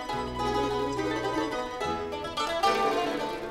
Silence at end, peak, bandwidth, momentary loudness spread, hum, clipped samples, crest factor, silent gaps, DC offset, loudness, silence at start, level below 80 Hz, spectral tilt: 0 s; -12 dBFS; 16 kHz; 7 LU; none; under 0.1%; 16 dB; none; under 0.1%; -29 LUFS; 0 s; -48 dBFS; -4.5 dB/octave